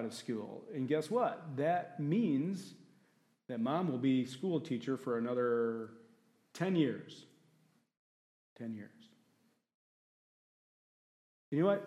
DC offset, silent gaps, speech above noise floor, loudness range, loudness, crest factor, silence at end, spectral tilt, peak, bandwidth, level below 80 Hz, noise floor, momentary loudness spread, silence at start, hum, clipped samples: under 0.1%; 7.97-8.56 s, 9.74-11.52 s; 40 dB; 18 LU; -36 LUFS; 20 dB; 0 s; -7 dB/octave; -18 dBFS; 13 kHz; -90 dBFS; -75 dBFS; 15 LU; 0 s; none; under 0.1%